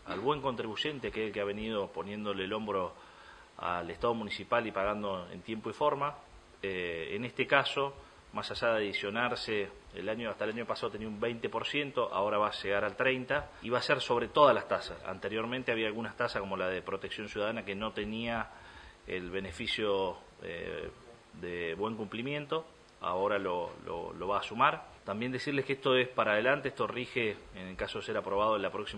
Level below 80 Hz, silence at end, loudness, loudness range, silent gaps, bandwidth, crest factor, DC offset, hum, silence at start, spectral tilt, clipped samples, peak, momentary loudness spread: -60 dBFS; 0 s; -33 LUFS; 6 LU; none; 10.5 kHz; 24 dB; under 0.1%; none; 0 s; -5 dB/octave; under 0.1%; -10 dBFS; 12 LU